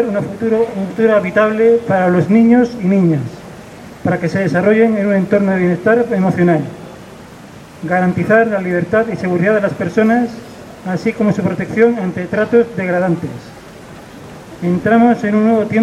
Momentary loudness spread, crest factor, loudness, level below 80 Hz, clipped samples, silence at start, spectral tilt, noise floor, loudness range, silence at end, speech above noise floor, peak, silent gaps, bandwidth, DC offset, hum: 21 LU; 14 dB; -14 LUFS; -50 dBFS; under 0.1%; 0 s; -8 dB/octave; -36 dBFS; 3 LU; 0 s; 22 dB; 0 dBFS; none; 12 kHz; under 0.1%; none